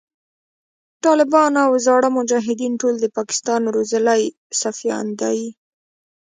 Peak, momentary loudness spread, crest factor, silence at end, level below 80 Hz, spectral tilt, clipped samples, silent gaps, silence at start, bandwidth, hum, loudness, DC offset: -2 dBFS; 8 LU; 18 dB; 0.8 s; -70 dBFS; -3 dB/octave; under 0.1%; 4.38-4.50 s; 1.05 s; 9.6 kHz; none; -18 LUFS; under 0.1%